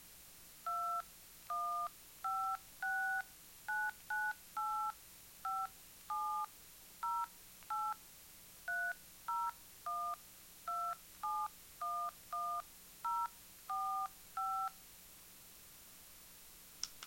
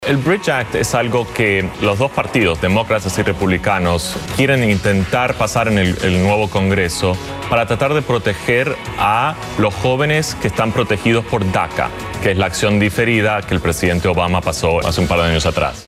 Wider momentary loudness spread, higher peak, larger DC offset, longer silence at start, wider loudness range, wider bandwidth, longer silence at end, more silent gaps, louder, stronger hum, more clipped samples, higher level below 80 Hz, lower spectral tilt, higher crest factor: first, 16 LU vs 4 LU; second, -20 dBFS vs -2 dBFS; neither; about the same, 0 s vs 0 s; about the same, 3 LU vs 1 LU; about the same, 16.5 kHz vs 15.5 kHz; about the same, 0 s vs 0.05 s; neither; second, -42 LUFS vs -16 LUFS; neither; neither; second, -74 dBFS vs -34 dBFS; second, -0.5 dB/octave vs -5 dB/octave; first, 22 dB vs 14 dB